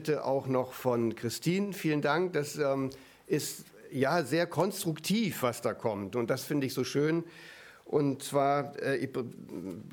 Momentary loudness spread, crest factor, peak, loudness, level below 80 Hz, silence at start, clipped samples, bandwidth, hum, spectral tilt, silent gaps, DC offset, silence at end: 12 LU; 18 dB; -12 dBFS; -31 LUFS; -72 dBFS; 0 s; under 0.1%; over 20 kHz; none; -5.5 dB/octave; none; under 0.1%; 0 s